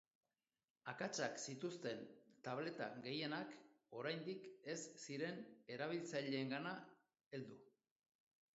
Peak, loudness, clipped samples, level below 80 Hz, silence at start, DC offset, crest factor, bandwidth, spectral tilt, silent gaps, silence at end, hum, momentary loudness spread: -28 dBFS; -48 LUFS; under 0.1%; under -90 dBFS; 0.85 s; under 0.1%; 22 dB; 7.6 kHz; -3.5 dB/octave; 7.26-7.31 s; 0.85 s; none; 11 LU